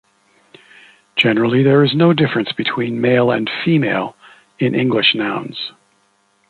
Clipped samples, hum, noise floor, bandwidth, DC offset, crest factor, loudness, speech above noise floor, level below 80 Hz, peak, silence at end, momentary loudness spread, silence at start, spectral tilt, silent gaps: under 0.1%; none; -60 dBFS; 9.6 kHz; under 0.1%; 18 dB; -16 LUFS; 44 dB; -60 dBFS; 0 dBFS; 0.8 s; 10 LU; 1.15 s; -8 dB/octave; none